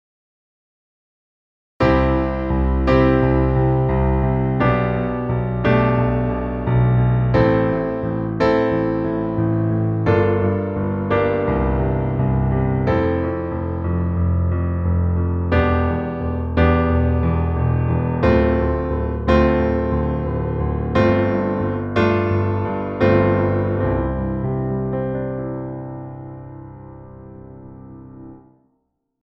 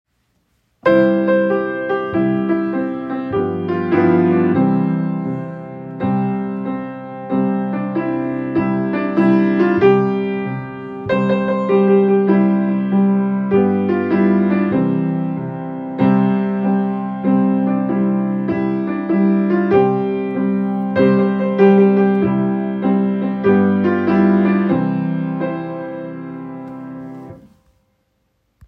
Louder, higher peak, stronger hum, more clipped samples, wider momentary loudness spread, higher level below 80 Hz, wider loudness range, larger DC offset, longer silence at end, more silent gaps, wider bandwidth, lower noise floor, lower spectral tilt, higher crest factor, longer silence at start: about the same, -19 LUFS vs -17 LUFS; about the same, -2 dBFS vs 0 dBFS; neither; neither; about the same, 11 LU vs 12 LU; first, -28 dBFS vs -58 dBFS; about the same, 6 LU vs 6 LU; neither; second, 0.85 s vs 1.3 s; neither; first, 5.8 kHz vs 5.2 kHz; first, -70 dBFS vs -66 dBFS; about the same, -10 dB/octave vs -10.5 dB/octave; about the same, 16 dB vs 16 dB; first, 1.8 s vs 0.85 s